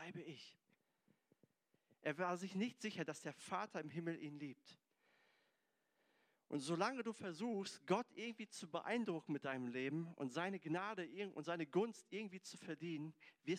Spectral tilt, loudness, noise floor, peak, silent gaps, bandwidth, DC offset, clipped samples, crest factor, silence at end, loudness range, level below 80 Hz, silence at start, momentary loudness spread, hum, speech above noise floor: -5.5 dB/octave; -46 LUFS; -85 dBFS; -26 dBFS; none; 14.5 kHz; under 0.1%; under 0.1%; 22 dB; 0 s; 5 LU; under -90 dBFS; 0 s; 11 LU; none; 40 dB